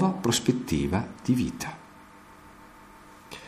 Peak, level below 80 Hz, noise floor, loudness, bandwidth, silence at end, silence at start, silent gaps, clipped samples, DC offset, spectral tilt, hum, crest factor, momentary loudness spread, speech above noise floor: -8 dBFS; -50 dBFS; -50 dBFS; -27 LUFS; 15.5 kHz; 0 s; 0 s; none; under 0.1%; under 0.1%; -5 dB/octave; none; 20 dB; 25 LU; 23 dB